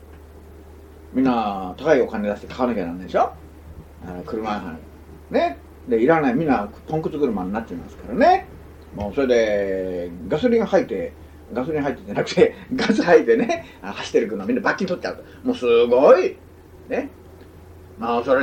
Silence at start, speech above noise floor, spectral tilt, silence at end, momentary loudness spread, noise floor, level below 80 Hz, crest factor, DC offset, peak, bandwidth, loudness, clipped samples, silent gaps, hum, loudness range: 0 s; 23 dB; -6 dB/octave; 0 s; 15 LU; -43 dBFS; -46 dBFS; 20 dB; under 0.1%; -2 dBFS; 9 kHz; -21 LUFS; under 0.1%; none; none; 4 LU